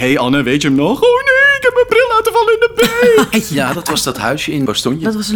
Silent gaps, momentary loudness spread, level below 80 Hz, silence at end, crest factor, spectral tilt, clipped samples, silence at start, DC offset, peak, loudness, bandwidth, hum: none; 7 LU; -42 dBFS; 0 s; 12 dB; -4 dB/octave; under 0.1%; 0 s; under 0.1%; 0 dBFS; -12 LUFS; over 20 kHz; none